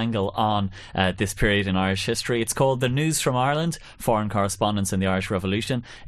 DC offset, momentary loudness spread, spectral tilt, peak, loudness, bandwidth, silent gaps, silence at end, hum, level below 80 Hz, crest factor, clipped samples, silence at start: under 0.1%; 4 LU; -4.5 dB/octave; -6 dBFS; -24 LUFS; 13 kHz; none; 0 s; none; -42 dBFS; 18 dB; under 0.1%; 0 s